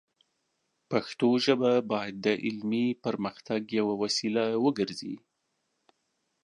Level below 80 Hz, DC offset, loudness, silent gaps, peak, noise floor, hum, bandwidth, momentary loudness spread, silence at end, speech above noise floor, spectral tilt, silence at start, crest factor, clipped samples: -74 dBFS; under 0.1%; -29 LUFS; none; -8 dBFS; -79 dBFS; none; 11 kHz; 9 LU; 1.25 s; 51 dB; -5 dB/octave; 0.9 s; 20 dB; under 0.1%